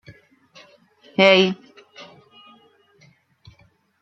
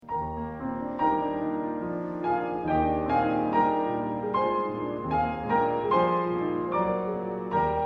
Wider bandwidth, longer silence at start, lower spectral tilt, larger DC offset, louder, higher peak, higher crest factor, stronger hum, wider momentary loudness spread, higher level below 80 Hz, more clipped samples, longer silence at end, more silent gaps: first, 7.8 kHz vs 5.8 kHz; first, 1.2 s vs 0.05 s; second, -5 dB/octave vs -9 dB/octave; neither; first, -16 LUFS vs -28 LUFS; first, 0 dBFS vs -12 dBFS; first, 24 dB vs 14 dB; neither; first, 29 LU vs 8 LU; second, -68 dBFS vs -50 dBFS; neither; first, 2 s vs 0 s; neither